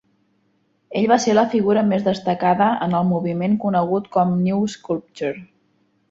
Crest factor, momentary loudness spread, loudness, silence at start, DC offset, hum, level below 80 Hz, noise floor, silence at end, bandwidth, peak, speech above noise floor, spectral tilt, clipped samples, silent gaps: 18 dB; 10 LU; -19 LUFS; 0.9 s; under 0.1%; none; -60 dBFS; -65 dBFS; 0.65 s; 7.8 kHz; -2 dBFS; 46 dB; -6.5 dB/octave; under 0.1%; none